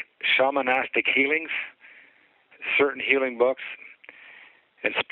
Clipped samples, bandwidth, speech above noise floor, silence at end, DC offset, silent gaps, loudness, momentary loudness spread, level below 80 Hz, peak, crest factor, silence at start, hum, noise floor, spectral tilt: under 0.1%; 4.5 kHz; 34 dB; 0.1 s; under 0.1%; none; -23 LUFS; 15 LU; -72 dBFS; -4 dBFS; 22 dB; 0 s; none; -59 dBFS; -6 dB/octave